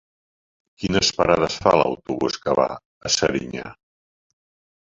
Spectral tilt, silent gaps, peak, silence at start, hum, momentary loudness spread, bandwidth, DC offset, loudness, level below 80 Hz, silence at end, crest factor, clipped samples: -3.5 dB/octave; 2.85-3.01 s; 0 dBFS; 0.8 s; none; 14 LU; 8 kHz; under 0.1%; -21 LUFS; -48 dBFS; 1.1 s; 22 dB; under 0.1%